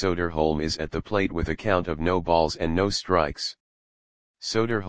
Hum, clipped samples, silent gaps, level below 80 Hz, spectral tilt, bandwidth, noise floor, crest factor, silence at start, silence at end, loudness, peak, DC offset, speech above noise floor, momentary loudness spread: none; under 0.1%; 3.60-4.34 s; -42 dBFS; -5 dB/octave; 9.8 kHz; under -90 dBFS; 20 dB; 0 s; 0 s; -25 LUFS; -4 dBFS; 1%; over 65 dB; 6 LU